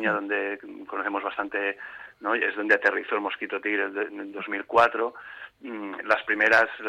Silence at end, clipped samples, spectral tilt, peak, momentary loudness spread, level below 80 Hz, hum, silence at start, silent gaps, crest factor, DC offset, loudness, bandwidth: 0 s; under 0.1%; -4.5 dB/octave; -6 dBFS; 16 LU; -70 dBFS; none; 0 s; none; 20 dB; under 0.1%; -25 LUFS; 12 kHz